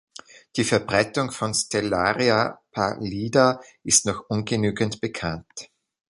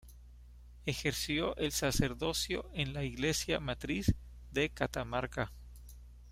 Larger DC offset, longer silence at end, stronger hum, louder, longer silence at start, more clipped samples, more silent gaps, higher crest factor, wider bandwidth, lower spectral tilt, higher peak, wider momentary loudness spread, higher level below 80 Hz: neither; first, 0.45 s vs 0 s; second, none vs 60 Hz at -50 dBFS; first, -23 LUFS vs -35 LUFS; first, 0.35 s vs 0.05 s; neither; neither; about the same, 20 dB vs 22 dB; second, 11.5 kHz vs 16 kHz; about the same, -3.5 dB/octave vs -4 dB/octave; first, -4 dBFS vs -16 dBFS; about the same, 11 LU vs 10 LU; about the same, -52 dBFS vs -48 dBFS